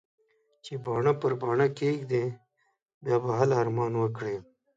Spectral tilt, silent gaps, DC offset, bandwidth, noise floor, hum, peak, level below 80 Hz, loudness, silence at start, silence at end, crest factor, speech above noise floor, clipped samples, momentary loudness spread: -7.5 dB/octave; 2.82-2.86 s, 2.94-3.01 s; under 0.1%; 7.8 kHz; -74 dBFS; none; -10 dBFS; -68 dBFS; -28 LUFS; 0.65 s; 0.35 s; 18 dB; 47 dB; under 0.1%; 13 LU